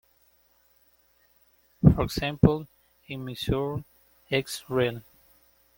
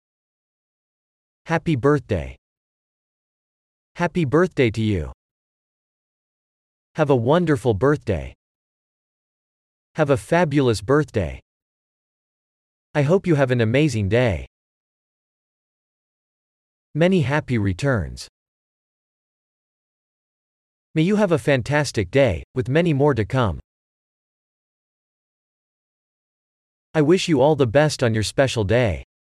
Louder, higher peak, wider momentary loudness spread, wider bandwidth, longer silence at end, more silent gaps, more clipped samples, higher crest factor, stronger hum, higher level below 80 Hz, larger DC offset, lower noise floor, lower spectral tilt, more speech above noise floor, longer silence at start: second, -26 LUFS vs -20 LUFS; about the same, -2 dBFS vs -4 dBFS; first, 16 LU vs 10 LU; first, 17 kHz vs 13 kHz; first, 0.8 s vs 0.35 s; second, none vs 2.38-3.95 s, 5.14-6.95 s, 8.35-9.95 s, 11.42-12.94 s, 14.47-16.94 s, 18.29-20.94 s, 22.44-22.54 s, 23.64-26.94 s; neither; first, 26 dB vs 18 dB; neither; about the same, -44 dBFS vs -46 dBFS; neither; second, -64 dBFS vs under -90 dBFS; about the same, -6.5 dB/octave vs -6.5 dB/octave; second, 40 dB vs over 71 dB; first, 1.85 s vs 1.45 s